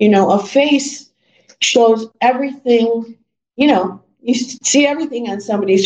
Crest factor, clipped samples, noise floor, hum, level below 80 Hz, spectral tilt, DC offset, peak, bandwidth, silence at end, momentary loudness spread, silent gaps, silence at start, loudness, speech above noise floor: 14 dB; under 0.1%; -52 dBFS; none; -64 dBFS; -3.5 dB/octave; under 0.1%; 0 dBFS; 9.4 kHz; 0 s; 11 LU; none; 0 s; -15 LUFS; 38 dB